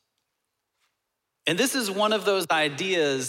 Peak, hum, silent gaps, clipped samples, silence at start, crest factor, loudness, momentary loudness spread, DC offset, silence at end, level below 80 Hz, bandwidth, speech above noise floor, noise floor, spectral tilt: -10 dBFS; none; none; under 0.1%; 1.45 s; 18 dB; -24 LUFS; 3 LU; under 0.1%; 0 s; -80 dBFS; 17 kHz; 57 dB; -81 dBFS; -3 dB/octave